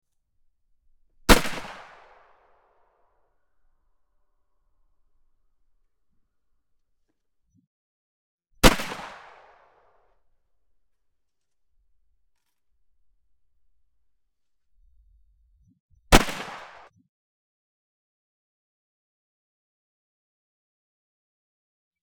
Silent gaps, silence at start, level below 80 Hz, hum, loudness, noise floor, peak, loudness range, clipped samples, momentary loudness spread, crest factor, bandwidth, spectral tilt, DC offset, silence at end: 7.67-8.38 s, 15.80-15.89 s; 1.3 s; -38 dBFS; none; -22 LUFS; -79 dBFS; 0 dBFS; 1 LU; under 0.1%; 23 LU; 32 dB; 17 kHz; -3.5 dB/octave; under 0.1%; 5.45 s